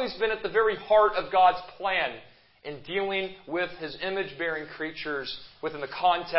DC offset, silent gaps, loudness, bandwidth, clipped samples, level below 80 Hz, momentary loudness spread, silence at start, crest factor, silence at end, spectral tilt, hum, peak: under 0.1%; none; -27 LUFS; 5.8 kHz; under 0.1%; -60 dBFS; 14 LU; 0 s; 20 dB; 0 s; -8 dB/octave; none; -8 dBFS